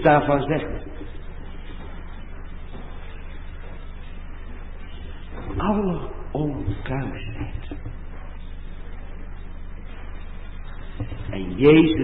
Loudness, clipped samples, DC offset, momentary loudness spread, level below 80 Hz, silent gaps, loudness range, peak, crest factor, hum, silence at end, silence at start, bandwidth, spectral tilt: -23 LUFS; under 0.1%; under 0.1%; 19 LU; -34 dBFS; none; 13 LU; -4 dBFS; 20 dB; none; 0 s; 0 s; 4.1 kHz; -11.5 dB/octave